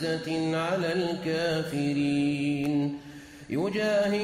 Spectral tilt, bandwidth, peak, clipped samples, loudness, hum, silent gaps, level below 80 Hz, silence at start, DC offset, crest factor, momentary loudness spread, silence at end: -6 dB/octave; 15 kHz; -16 dBFS; under 0.1%; -28 LUFS; none; none; -62 dBFS; 0 s; under 0.1%; 12 dB; 7 LU; 0 s